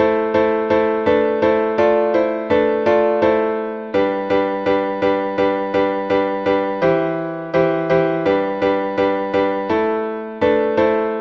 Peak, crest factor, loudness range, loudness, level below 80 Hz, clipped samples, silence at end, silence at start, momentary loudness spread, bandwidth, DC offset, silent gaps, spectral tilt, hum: -2 dBFS; 14 dB; 2 LU; -18 LUFS; -50 dBFS; under 0.1%; 0 s; 0 s; 4 LU; 6.6 kHz; under 0.1%; none; -7.5 dB/octave; none